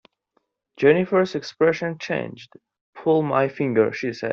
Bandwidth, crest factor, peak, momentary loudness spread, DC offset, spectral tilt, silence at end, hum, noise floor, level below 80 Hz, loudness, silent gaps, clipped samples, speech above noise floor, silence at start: 7 kHz; 18 dB; -4 dBFS; 9 LU; under 0.1%; -5.5 dB/octave; 0 s; none; -71 dBFS; -64 dBFS; -22 LUFS; 2.81-2.93 s; under 0.1%; 49 dB; 0.8 s